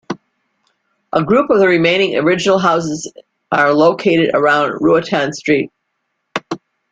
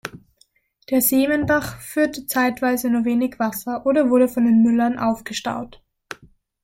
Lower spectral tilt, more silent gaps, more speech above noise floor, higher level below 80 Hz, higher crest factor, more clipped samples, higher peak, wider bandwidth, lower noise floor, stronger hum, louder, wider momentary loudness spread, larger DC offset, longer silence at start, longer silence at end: about the same, -5 dB/octave vs -4.5 dB/octave; neither; first, 57 dB vs 42 dB; about the same, -56 dBFS vs -54 dBFS; about the same, 14 dB vs 14 dB; neither; first, 0 dBFS vs -6 dBFS; second, 9.2 kHz vs 16.5 kHz; first, -71 dBFS vs -61 dBFS; neither; first, -14 LUFS vs -20 LUFS; about the same, 15 LU vs 17 LU; neither; about the same, 0.1 s vs 0.05 s; second, 0.35 s vs 0.95 s